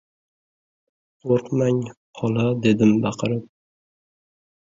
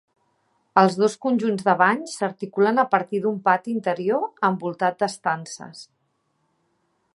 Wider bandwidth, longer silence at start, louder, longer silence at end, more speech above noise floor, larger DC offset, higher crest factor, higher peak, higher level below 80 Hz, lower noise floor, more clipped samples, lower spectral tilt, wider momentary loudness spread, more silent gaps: second, 7.6 kHz vs 11.5 kHz; first, 1.25 s vs 0.75 s; about the same, -21 LUFS vs -22 LUFS; about the same, 1.25 s vs 1.3 s; first, over 70 dB vs 49 dB; neither; about the same, 18 dB vs 22 dB; about the same, -4 dBFS vs -2 dBFS; first, -58 dBFS vs -76 dBFS; first, under -90 dBFS vs -71 dBFS; neither; first, -7.5 dB/octave vs -5.5 dB/octave; about the same, 11 LU vs 9 LU; first, 1.97-2.13 s vs none